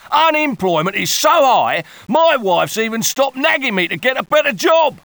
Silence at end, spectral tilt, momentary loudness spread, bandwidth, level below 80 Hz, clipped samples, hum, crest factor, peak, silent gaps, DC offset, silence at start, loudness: 0.15 s; -3 dB/octave; 5 LU; over 20 kHz; -60 dBFS; under 0.1%; none; 14 dB; -2 dBFS; none; under 0.1%; 0.05 s; -14 LUFS